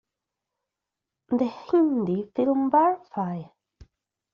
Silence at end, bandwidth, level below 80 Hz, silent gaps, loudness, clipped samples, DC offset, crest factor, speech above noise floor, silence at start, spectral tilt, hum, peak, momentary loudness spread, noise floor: 0.9 s; 6.6 kHz; -64 dBFS; none; -24 LUFS; under 0.1%; under 0.1%; 18 dB; 63 dB; 1.3 s; -7.5 dB/octave; none; -10 dBFS; 10 LU; -86 dBFS